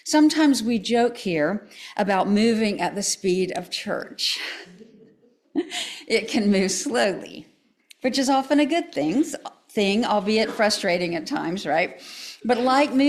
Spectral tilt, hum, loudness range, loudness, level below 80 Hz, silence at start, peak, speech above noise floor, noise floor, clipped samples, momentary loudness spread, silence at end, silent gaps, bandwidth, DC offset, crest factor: -4 dB/octave; none; 4 LU; -23 LUFS; -62 dBFS; 0.05 s; -8 dBFS; 36 dB; -58 dBFS; under 0.1%; 11 LU; 0 s; none; 14.5 kHz; under 0.1%; 14 dB